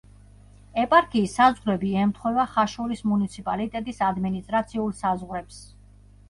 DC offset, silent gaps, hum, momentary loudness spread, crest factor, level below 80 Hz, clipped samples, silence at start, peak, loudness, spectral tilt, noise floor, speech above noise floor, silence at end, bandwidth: under 0.1%; none; 50 Hz at -45 dBFS; 11 LU; 20 dB; -50 dBFS; under 0.1%; 0.75 s; -4 dBFS; -24 LUFS; -6 dB/octave; -51 dBFS; 27 dB; 0.65 s; 11.5 kHz